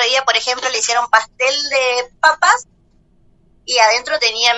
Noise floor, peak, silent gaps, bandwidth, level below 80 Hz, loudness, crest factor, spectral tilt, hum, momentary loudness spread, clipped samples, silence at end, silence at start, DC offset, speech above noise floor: -54 dBFS; 0 dBFS; none; 11.5 kHz; -56 dBFS; -14 LUFS; 16 dB; 2 dB/octave; none; 5 LU; under 0.1%; 0 s; 0 s; under 0.1%; 38 dB